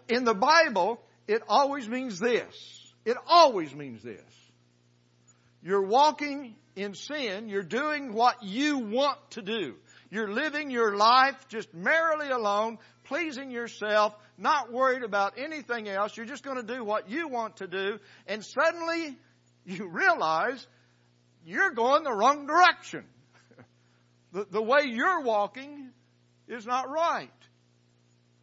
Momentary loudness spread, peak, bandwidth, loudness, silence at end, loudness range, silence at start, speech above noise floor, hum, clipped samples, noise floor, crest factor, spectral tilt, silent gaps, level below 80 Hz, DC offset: 18 LU; -8 dBFS; 8 kHz; -27 LUFS; 1.15 s; 5 LU; 0.1 s; 38 dB; 60 Hz at -65 dBFS; under 0.1%; -65 dBFS; 20 dB; -3.5 dB/octave; none; -84 dBFS; under 0.1%